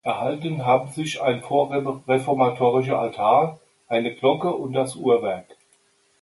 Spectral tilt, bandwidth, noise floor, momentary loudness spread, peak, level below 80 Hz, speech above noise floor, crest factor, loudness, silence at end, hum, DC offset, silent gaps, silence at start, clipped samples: -6 dB/octave; 11.5 kHz; -62 dBFS; 7 LU; -6 dBFS; -66 dBFS; 41 dB; 18 dB; -22 LUFS; 0.7 s; none; under 0.1%; none; 0.05 s; under 0.1%